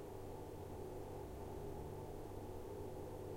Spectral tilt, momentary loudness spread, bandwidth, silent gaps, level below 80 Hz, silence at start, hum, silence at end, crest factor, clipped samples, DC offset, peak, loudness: -7 dB/octave; 2 LU; 16.5 kHz; none; -58 dBFS; 0 s; none; 0 s; 12 dB; under 0.1%; under 0.1%; -36 dBFS; -51 LUFS